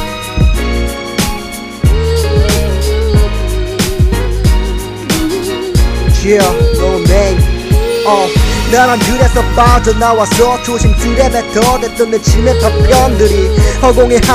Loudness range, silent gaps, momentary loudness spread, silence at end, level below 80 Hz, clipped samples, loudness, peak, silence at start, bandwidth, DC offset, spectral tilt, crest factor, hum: 4 LU; none; 7 LU; 0 s; -14 dBFS; 0.3%; -11 LUFS; 0 dBFS; 0 s; 16 kHz; under 0.1%; -5 dB/octave; 10 dB; none